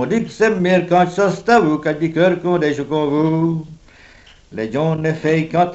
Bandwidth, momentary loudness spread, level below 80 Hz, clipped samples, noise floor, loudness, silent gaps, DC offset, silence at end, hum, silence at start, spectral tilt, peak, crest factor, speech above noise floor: 8.2 kHz; 6 LU; -50 dBFS; under 0.1%; -45 dBFS; -17 LUFS; none; under 0.1%; 0 s; none; 0 s; -7 dB/octave; -2 dBFS; 14 dB; 29 dB